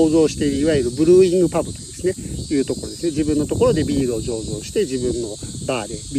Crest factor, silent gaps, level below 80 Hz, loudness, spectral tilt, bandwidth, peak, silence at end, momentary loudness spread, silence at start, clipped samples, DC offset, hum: 16 dB; none; -38 dBFS; -20 LUFS; -5.5 dB/octave; 14.5 kHz; -4 dBFS; 0 s; 11 LU; 0 s; under 0.1%; under 0.1%; none